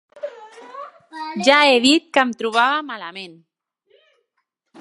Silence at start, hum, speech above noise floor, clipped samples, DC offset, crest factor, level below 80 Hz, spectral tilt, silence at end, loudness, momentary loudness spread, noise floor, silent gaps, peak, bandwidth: 0.15 s; none; 56 dB; under 0.1%; under 0.1%; 20 dB; -76 dBFS; -2.5 dB/octave; 1.5 s; -16 LUFS; 24 LU; -74 dBFS; none; 0 dBFS; 11.5 kHz